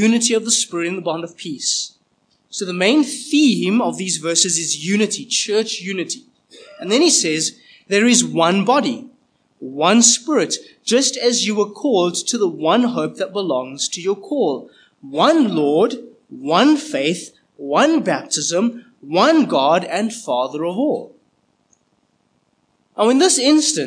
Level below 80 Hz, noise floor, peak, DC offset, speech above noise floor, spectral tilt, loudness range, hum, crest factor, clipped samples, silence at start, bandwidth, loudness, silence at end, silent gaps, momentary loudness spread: -78 dBFS; -64 dBFS; 0 dBFS; under 0.1%; 47 dB; -3 dB/octave; 3 LU; none; 18 dB; under 0.1%; 0 s; 10.5 kHz; -17 LUFS; 0 s; none; 12 LU